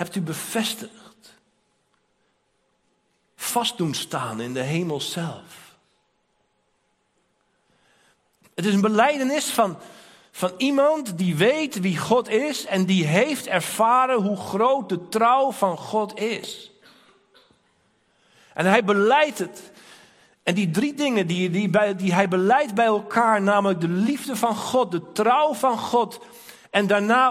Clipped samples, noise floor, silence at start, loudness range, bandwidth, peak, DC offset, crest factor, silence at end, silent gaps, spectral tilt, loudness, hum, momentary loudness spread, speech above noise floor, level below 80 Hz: under 0.1%; -69 dBFS; 0 s; 10 LU; 16 kHz; -2 dBFS; under 0.1%; 22 dB; 0 s; none; -5 dB/octave; -22 LUFS; none; 10 LU; 48 dB; -70 dBFS